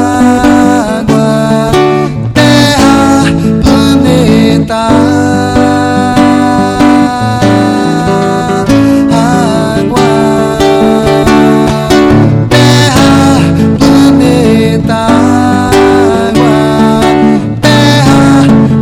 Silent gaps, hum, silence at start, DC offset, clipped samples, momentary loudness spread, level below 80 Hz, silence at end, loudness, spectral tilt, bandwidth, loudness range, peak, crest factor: none; none; 0 s; 0.3%; 9%; 4 LU; -28 dBFS; 0 s; -6 LUFS; -6 dB/octave; 15.5 kHz; 2 LU; 0 dBFS; 6 dB